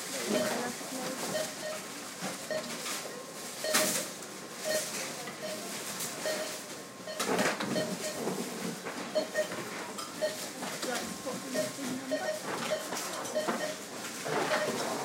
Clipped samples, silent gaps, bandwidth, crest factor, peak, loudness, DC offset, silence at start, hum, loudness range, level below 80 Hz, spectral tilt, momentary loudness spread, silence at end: under 0.1%; none; 16 kHz; 22 dB; -14 dBFS; -34 LUFS; under 0.1%; 0 s; none; 2 LU; -78 dBFS; -2.5 dB/octave; 9 LU; 0 s